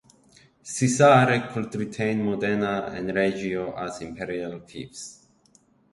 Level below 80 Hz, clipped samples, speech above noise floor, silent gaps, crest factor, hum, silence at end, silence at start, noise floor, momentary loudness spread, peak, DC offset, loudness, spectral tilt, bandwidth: -58 dBFS; under 0.1%; 37 dB; none; 20 dB; none; 0.8 s; 0.65 s; -61 dBFS; 21 LU; -4 dBFS; under 0.1%; -24 LUFS; -5.5 dB/octave; 11.5 kHz